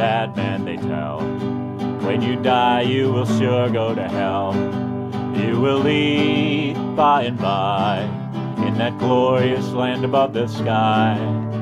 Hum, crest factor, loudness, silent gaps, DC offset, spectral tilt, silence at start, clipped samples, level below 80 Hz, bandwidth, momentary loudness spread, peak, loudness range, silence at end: none; 16 dB; -20 LUFS; none; under 0.1%; -7 dB/octave; 0 s; under 0.1%; -56 dBFS; 12 kHz; 8 LU; -4 dBFS; 1 LU; 0 s